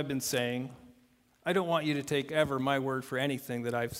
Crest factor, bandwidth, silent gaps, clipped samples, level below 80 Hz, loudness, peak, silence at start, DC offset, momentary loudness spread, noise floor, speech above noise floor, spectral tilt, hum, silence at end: 20 dB; 16 kHz; none; under 0.1%; -66 dBFS; -32 LUFS; -12 dBFS; 0 s; under 0.1%; 6 LU; -66 dBFS; 34 dB; -4.5 dB/octave; none; 0 s